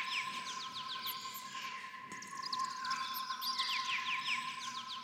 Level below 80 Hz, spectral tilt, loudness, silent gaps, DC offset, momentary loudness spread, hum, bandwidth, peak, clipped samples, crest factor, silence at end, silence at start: under -90 dBFS; 0.5 dB/octave; -39 LUFS; none; under 0.1%; 9 LU; none; 16 kHz; -24 dBFS; under 0.1%; 18 dB; 0 s; 0 s